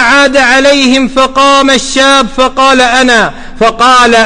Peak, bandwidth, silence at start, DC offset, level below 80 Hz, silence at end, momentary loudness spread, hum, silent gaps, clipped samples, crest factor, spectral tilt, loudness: 0 dBFS; 11.5 kHz; 0 s; under 0.1%; -28 dBFS; 0 s; 4 LU; none; none; 0.4%; 6 dB; -2 dB/octave; -6 LUFS